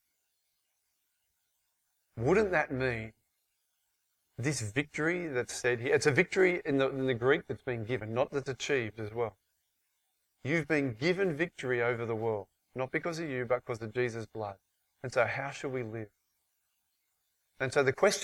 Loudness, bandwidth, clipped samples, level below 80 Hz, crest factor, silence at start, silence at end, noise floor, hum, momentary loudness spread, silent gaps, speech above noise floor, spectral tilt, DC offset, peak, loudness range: -32 LUFS; 14 kHz; under 0.1%; -64 dBFS; 22 dB; 2.15 s; 0 s; -80 dBFS; none; 12 LU; none; 48 dB; -5 dB/octave; under 0.1%; -10 dBFS; 6 LU